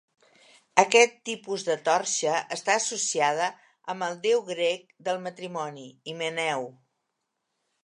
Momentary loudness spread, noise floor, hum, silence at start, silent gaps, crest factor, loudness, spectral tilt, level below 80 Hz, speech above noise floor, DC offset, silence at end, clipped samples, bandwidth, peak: 15 LU; -81 dBFS; none; 0.75 s; none; 26 dB; -26 LUFS; -1.5 dB/octave; -84 dBFS; 54 dB; under 0.1%; 1.15 s; under 0.1%; 11 kHz; -2 dBFS